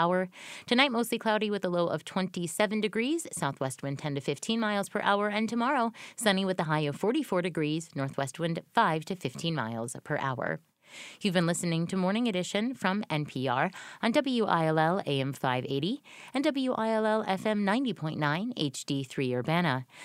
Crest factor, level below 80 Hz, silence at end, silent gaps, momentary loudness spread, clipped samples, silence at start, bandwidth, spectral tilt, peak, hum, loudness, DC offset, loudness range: 22 dB; -72 dBFS; 0 s; none; 7 LU; under 0.1%; 0 s; 15.5 kHz; -5 dB/octave; -8 dBFS; none; -30 LUFS; under 0.1%; 2 LU